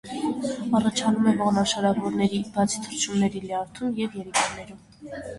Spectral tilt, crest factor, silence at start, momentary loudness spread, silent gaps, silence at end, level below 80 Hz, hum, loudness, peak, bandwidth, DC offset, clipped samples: -4.5 dB/octave; 16 dB; 0.05 s; 10 LU; none; 0 s; -56 dBFS; none; -25 LUFS; -8 dBFS; 11.5 kHz; under 0.1%; under 0.1%